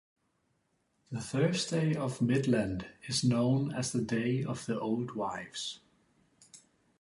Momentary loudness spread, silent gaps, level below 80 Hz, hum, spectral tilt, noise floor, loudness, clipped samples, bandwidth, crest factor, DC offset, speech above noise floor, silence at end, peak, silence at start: 11 LU; none; -62 dBFS; none; -5.5 dB/octave; -76 dBFS; -32 LUFS; under 0.1%; 11.5 kHz; 16 dB; under 0.1%; 45 dB; 0.4 s; -16 dBFS; 1.1 s